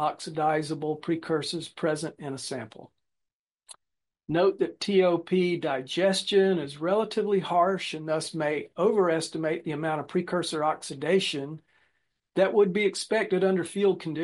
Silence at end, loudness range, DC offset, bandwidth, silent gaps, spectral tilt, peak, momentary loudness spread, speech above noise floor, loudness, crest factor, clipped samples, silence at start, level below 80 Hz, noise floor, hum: 0 s; 6 LU; under 0.1%; 11.5 kHz; 3.33-3.55 s; -5 dB/octave; -10 dBFS; 9 LU; 59 dB; -27 LUFS; 16 dB; under 0.1%; 0 s; -74 dBFS; -86 dBFS; none